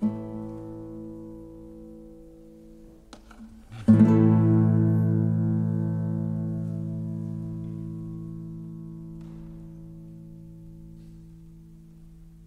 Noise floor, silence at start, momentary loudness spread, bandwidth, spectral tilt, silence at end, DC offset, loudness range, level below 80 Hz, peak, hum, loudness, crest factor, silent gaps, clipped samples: -49 dBFS; 0 s; 26 LU; 4.4 kHz; -11 dB/octave; 0 s; under 0.1%; 21 LU; -52 dBFS; -6 dBFS; none; -25 LUFS; 20 dB; none; under 0.1%